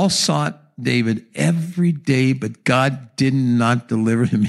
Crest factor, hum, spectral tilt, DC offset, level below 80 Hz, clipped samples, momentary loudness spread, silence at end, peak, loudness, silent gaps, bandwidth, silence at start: 16 dB; none; -5.5 dB/octave; under 0.1%; -60 dBFS; under 0.1%; 5 LU; 0 s; -2 dBFS; -19 LUFS; none; 13 kHz; 0 s